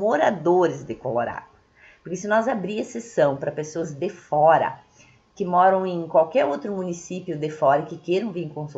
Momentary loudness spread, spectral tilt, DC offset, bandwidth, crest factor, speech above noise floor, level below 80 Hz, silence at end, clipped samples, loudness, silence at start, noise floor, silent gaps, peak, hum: 13 LU; -6 dB/octave; under 0.1%; 8 kHz; 20 dB; 33 dB; -64 dBFS; 0.05 s; under 0.1%; -23 LUFS; 0 s; -55 dBFS; none; -4 dBFS; none